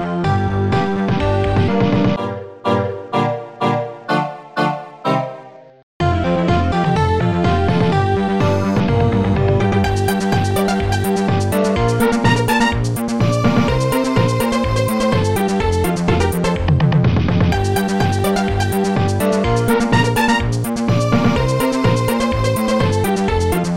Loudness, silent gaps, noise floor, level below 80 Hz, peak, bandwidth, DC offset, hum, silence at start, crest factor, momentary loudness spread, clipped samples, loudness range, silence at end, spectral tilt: -17 LUFS; 5.83-6.00 s; -38 dBFS; -32 dBFS; -2 dBFS; 16.5 kHz; under 0.1%; none; 0 s; 14 dB; 5 LU; under 0.1%; 3 LU; 0 s; -6.5 dB/octave